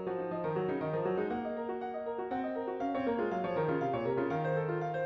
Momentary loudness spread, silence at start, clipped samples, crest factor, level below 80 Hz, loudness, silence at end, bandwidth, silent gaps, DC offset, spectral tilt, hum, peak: 5 LU; 0 s; under 0.1%; 12 dB; -68 dBFS; -34 LUFS; 0 s; 6.2 kHz; none; under 0.1%; -9 dB/octave; none; -22 dBFS